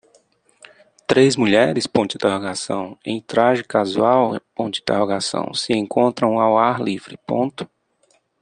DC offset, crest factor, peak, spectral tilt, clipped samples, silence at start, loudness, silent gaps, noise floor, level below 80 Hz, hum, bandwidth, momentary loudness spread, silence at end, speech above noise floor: under 0.1%; 18 dB; -2 dBFS; -5 dB/octave; under 0.1%; 1.1 s; -19 LUFS; none; -62 dBFS; -60 dBFS; none; 10 kHz; 10 LU; 0.75 s; 44 dB